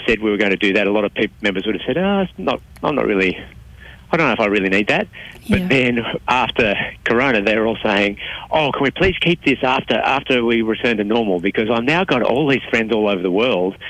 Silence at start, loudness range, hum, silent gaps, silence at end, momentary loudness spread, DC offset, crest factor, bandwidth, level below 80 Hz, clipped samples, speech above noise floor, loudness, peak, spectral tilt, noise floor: 0 s; 2 LU; none; none; 0 s; 5 LU; under 0.1%; 12 dB; 13.5 kHz; -42 dBFS; under 0.1%; 22 dB; -17 LUFS; -6 dBFS; -6 dB/octave; -40 dBFS